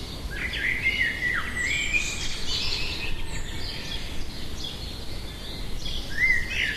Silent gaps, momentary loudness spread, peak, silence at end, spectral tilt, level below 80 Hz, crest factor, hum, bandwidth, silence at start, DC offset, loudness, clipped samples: none; 13 LU; -10 dBFS; 0 s; -2.5 dB/octave; -36 dBFS; 18 dB; none; 13.5 kHz; 0 s; under 0.1%; -27 LUFS; under 0.1%